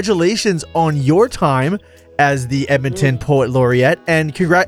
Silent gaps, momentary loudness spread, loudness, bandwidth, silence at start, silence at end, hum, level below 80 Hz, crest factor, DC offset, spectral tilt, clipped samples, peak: none; 4 LU; -15 LUFS; 14.5 kHz; 0 s; 0 s; none; -44 dBFS; 14 dB; under 0.1%; -6 dB/octave; under 0.1%; 0 dBFS